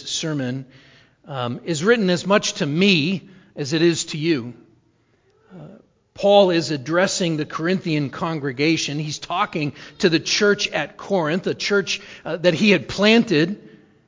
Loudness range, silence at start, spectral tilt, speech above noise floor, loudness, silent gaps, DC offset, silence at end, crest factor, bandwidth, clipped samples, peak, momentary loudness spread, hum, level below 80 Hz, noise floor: 3 LU; 0 s; -4.5 dB/octave; 41 dB; -20 LUFS; none; under 0.1%; 0.4 s; 20 dB; 7.6 kHz; under 0.1%; -2 dBFS; 11 LU; none; -58 dBFS; -61 dBFS